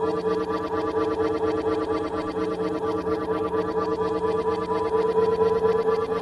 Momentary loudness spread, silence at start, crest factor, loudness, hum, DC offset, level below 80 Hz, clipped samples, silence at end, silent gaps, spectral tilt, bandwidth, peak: 5 LU; 0 s; 14 dB; -25 LUFS; none; under 0.1%; -50 dBFS; under 0.1%; 0 s; none; -7 dB/octave; 11 kHz; -10 dBFS